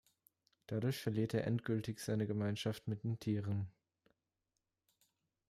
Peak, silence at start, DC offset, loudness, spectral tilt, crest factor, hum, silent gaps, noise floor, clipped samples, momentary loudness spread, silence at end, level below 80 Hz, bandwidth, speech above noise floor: -24 dBFS; 0.7 s; under 0.1%; -40 LUFS; -7 dB/octave; 18 dB; none; none; -89 dBFS; under 0.1%; 5 LU; 1.8 s; -74 dBFS; 15 kHz; 51 dB